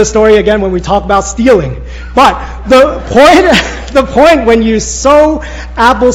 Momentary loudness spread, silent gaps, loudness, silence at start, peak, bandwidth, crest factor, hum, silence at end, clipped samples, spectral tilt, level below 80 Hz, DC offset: 8 LU; none; -7 LUFS; 0 s; 0 dBFS; 18 kHz; 8 dB; none; 0 s; 8%; -4.5 dB/octave; -24 dBFS; under 0.1%